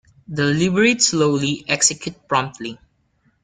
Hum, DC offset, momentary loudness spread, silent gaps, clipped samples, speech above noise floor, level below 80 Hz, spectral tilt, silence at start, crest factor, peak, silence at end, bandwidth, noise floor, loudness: none; under 0.1%; 15 LU; none; under 0.1%; 44 dB; -56 dBFS; -3.5 dB/octave; 0.3 s; 18 dB; -2 dBFS; 0.65 s; 10 kHz; -63 dBFS; -18 LUFS